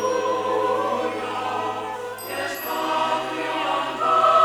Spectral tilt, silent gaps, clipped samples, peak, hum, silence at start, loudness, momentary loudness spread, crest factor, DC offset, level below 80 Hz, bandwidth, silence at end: -3.5 dB/octave; none; under 0.1%; -6 dBFS; none; 0 s; -24 LUFS; 8 LU; 16 dB; under 0.1%; -64 dBFS; over 20 kHz; 0 s